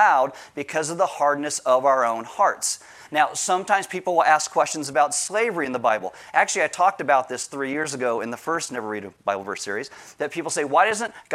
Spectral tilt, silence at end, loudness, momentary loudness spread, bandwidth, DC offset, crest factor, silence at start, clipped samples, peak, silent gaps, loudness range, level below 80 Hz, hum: -2.5 dB/octave; 0 s; -23 LUFS; 10 LU; 15.5 kHz; under 0.1%; 20 dB; 0 s; under 0.1%; -2 dBFS; none; 5 LU; -74 dBFS; none